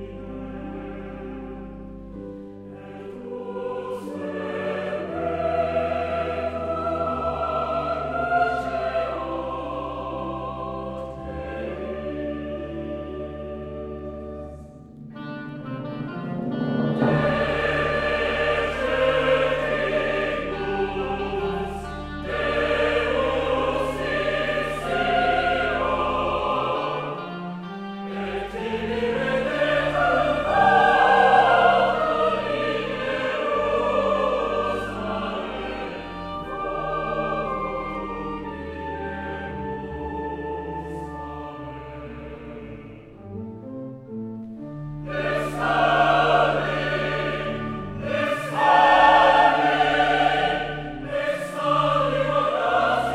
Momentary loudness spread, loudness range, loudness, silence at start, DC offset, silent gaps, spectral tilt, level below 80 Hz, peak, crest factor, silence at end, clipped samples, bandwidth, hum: 17 LU; 15 LU; -23 LUFS; 0 s; under 0.1%; none; -6 dB/octave; -44 dBFS; -4 dBFS; 20 dB; 0 s; under 0.1%; 13.5 kHz; none